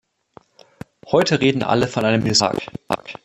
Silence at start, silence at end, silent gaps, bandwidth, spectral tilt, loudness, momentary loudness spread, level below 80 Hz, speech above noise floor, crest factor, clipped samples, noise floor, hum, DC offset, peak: 1.05 s; 0.1 s; none; 14 kHz; -4.5 dB/octave; -19 LUFS; 11 LU; -52 dBFS; 32 dB; 18 dB; under 0.1%; -50 dBFS; none; under 0.1%; -2 dBFS